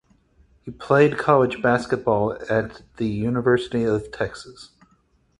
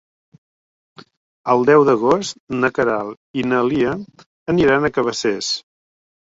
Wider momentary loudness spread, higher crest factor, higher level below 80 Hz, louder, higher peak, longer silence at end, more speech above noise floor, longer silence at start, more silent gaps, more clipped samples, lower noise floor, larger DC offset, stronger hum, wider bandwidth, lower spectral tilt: first, 20 LU vs 12 LU; about the same, 20 dB vs 18 dB; about the same, -52 dBFS vs -52 dBFS; second, -21 LUFS vs -18 LUFS; about the same, -2 dBFS vs -2 dBFS; about the same, 0.75 s vs 0.7 s; second, 41 dB vs over 73 dB; second, 0.65 s vs 1.45 s; second, none vs 2.40-2.47 s, 3.17-3.34 s, 4.26-4.46 s; neither; second, -62 dBFS vs under -90 dBFS; neither; neither; first, 11 kHz vs 8 kHz; first, -7 dB/octave vs -5 dB/octave